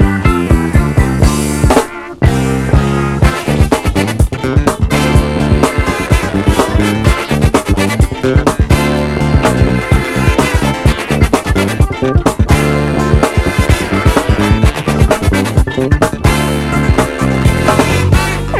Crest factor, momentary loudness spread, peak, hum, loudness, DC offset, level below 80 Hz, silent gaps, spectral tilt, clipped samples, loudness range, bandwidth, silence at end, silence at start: 10 dB; 3 LU; 0 dBFS; none; -12 LUFS; under 0.1%; -16 dBFS; none; -6 dB/octave; 0.5%; 1 LU; 15.5 kHz; 0 s; 0 s